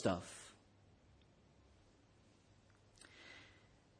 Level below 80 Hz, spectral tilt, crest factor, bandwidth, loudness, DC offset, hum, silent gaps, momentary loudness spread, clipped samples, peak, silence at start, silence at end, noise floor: -74 dBFS; -5 dB/octave; 28 dB; 10.5 kHz; -49 LUFS; under 0.1%; none; none; 20 LU; under 0.1%; -22 dBFS; 0 s; 0.45 s; -70 dBFS